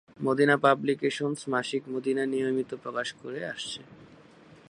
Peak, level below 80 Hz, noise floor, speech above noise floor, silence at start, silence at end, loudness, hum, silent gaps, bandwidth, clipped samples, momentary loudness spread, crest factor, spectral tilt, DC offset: -8 dBFS; -74 dBFS; -54 dBFS; 26 dB; 0.2 s; 0.15 s; -28 LUFS; none; none; 11 kHz; under 0.1%; 13 LU; 22 dB; -5 dB/octave; under 0.1%